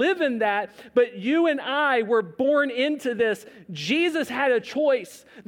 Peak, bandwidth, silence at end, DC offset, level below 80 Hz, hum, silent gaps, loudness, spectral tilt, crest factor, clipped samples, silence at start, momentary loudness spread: -8 dBFS; 16.5 kHz; 0.05 s; under 0.1%; -72 dBFS; none; none; -23 LUFS; -4.5 dB/octave; 14 dB; under 0.1%; 0 s; 5 LU